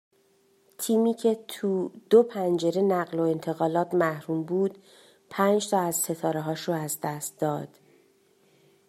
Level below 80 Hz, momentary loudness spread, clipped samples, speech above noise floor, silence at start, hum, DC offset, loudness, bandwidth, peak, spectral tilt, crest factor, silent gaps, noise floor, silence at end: -76 dBFS; 9 LU; under 0.1%; 39 dB; 0.8 s; none; under 0.1%; -26 LUFS; 16 kHz; -8 dBFS; -5 dB/octave; 20 dB; none; -64 dBFS; 1.2 s